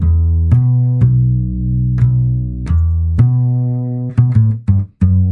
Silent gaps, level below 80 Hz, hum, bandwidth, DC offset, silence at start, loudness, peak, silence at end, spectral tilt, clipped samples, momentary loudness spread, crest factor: none; -24 dBFS; none; 2.4 kHz; under 0.1%; 0 s; -14 LUFS; 0 dBFS; 0 s; -11.5 dB/octave; under 0.1%; 5 LU; 12 dB